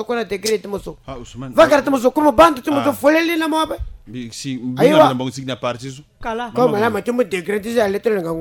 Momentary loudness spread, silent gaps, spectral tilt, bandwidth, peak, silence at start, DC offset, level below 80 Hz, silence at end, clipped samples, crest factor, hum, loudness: 18 LU; none; -5 dB/octave; 17.5 kHz; -2 dBFS; 0 s; under 0.1%; -42 dBFS; 0 s; under 0.1%; 16 dB; none; -17 LUFS